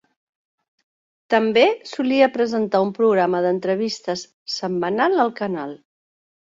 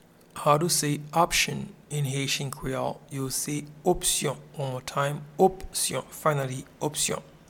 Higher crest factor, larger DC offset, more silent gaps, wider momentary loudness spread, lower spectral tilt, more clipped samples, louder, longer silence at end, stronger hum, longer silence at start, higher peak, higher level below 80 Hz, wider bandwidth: about the same, 18 dB vs 20 dB; neither; first, 4.34-4.46 s vs none; about the same, 10 LU vs 10 LU; first, -5 dB/octave vs -3.5 dB/octave; neither; first, -20 LUFS vs -27 LUFS; first, 0.75 s vs 0.2 s; neither; first, 1.3 s vs 0.35 s; about the same, -4 dBFS vs -6 dBFS; second, -68 dBFS vs -50 dBFS; second, 7.8 kHz vs 18.5 kHz